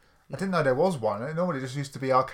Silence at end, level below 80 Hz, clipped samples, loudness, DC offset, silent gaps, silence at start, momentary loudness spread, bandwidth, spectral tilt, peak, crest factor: 0 s; -60 dBFS; under 0.1%; -27 LUFS; under 0.1%; none; 0.3 s; 10 LU; 15 kHz; -6.5 dB/octave; -10 dBFS; 18 dB